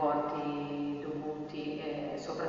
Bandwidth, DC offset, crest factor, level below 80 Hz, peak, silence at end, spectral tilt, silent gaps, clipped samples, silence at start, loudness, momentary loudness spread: 7.4 kHz; under 0.1%; 16 dB; -66 dBFS; -20 dBFS; 0 s; -5 dB/octave; none; under 0.1%; 0 s; -37 LUFS; 6 LU